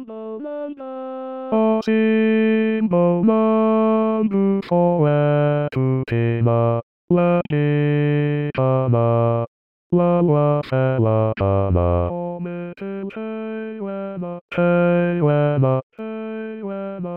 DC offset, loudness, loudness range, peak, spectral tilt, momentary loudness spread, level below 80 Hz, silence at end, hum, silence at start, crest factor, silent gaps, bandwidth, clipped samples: 0.2%; -19 LUFS; 5 LU; -6 dBFS; -10.5 dB/octave; 13 LU; -46 dBFS; 0 s; none; 0 s; 12 dB; 6.83-7.08 s, 9.47-9.90 s, 14.41-14.49 s, 15.83-15.90 s; 5.8 kHz; under 0.1%